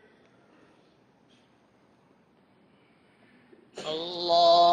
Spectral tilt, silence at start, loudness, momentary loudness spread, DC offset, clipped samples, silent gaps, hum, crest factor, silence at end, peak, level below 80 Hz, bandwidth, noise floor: -4 dB/octave; 3.75 s; -24 LUFS; 21 LU; under 0.1%; under 0.1%; none; none; 18 dB; 0 s; -10 dBFS; -74 dBFS; 8.8 kHz; -63 dBFS